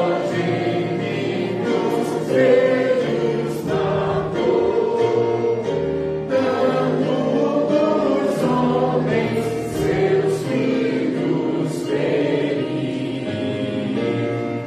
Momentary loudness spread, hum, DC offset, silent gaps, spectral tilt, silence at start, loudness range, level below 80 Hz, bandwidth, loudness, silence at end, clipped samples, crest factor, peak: 5 LU; none; under 0.1%; none; -7 dB/octave; 0 s; 2 LU; -50 dBFS; 14.5 kHz; -20 LUFS; 0 s; under 0.1%; 16 dB; -4 dBFS